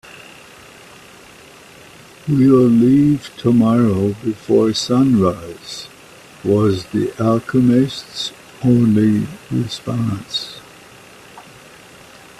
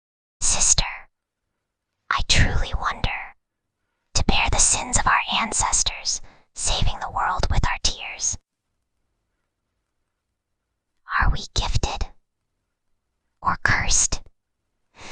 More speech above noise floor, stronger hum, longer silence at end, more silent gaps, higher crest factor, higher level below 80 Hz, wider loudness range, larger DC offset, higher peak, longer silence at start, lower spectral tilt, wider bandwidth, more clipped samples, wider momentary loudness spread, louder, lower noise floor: second, 27 dB vs 59 dB; neither; first, 1 s vs 0 s; neither; second, 16 dB vs 22 dB; second, -50 dBFS vs -30 dBFS; second, 5 LU vs 9 LU; neither; about the same, -2 dBFS vs -2 dBFS; first, 2.25 s vs 0.4 s; first, -7 dB/octave vs -1.5 dB/octave; first, 13.5 kHz vs 10 kHz; neither; first, 18 LU vs 12 LU; first, -16 LUFS vs -22 LUFS; second, -42 dBFS vs -80 dBFS